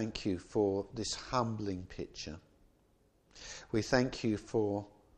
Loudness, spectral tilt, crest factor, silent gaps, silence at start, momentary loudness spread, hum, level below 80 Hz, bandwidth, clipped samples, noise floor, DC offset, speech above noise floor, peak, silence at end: -35 LUFS; -5 dB/octave; 24 dB; none; 0 s; 14 LU; none; -58 dBFS; 11 kHz; under 0.1%; -70 dBFS; under 0.1%; 35 dB; -12 dBFS; 0.25 s